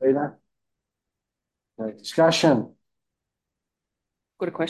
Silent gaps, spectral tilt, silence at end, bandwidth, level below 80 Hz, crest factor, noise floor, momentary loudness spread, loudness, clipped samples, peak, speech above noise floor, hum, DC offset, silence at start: none; -5 dB/octave; 0 s; 12.5 kHz; -70 dBFS; 20 dB; -86 dBFS; 16 LU; -22 LUFS; under 0.1%; -6 dBFS; 64 dB; none; under 0.1%; 0 s